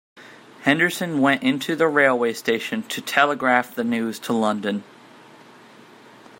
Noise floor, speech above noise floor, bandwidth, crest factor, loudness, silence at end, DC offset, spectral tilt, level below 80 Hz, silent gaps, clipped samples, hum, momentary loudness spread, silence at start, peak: -47 dBFS; 26 dB; 16.5 kHz; 22 dB; -21 LUFS; 1.6 s; under 0.1%; -4.5 dB/octave; -72 dBFS; none; under 0.1%; none; 8 LU; 0.15 s; -2 dBFS